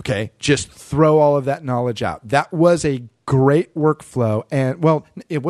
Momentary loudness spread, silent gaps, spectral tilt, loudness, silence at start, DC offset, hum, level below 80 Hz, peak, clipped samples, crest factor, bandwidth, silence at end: 8 LU; none; -6.5 dB/octave; -18 LUFS; 0 s; under 0.1%; none; -48 dBFS; -2 dBFS; under 0.1%; 16 dB; 12.5 kHz; 0 s